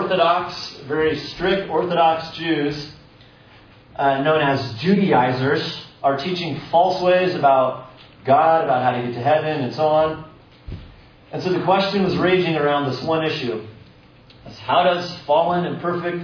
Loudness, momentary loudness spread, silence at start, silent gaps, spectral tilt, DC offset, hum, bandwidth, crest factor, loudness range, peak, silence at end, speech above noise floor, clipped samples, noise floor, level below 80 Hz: -19 LUFS; 12 LU; 0 s; none; -6.5 dB/octave; under 0.1%; none; 5.4 kHz; 16 dB; 4 LU; -4 dBFS; 0 s; 29 dB; under 0.1%; -48 dBFS; -52 dBFS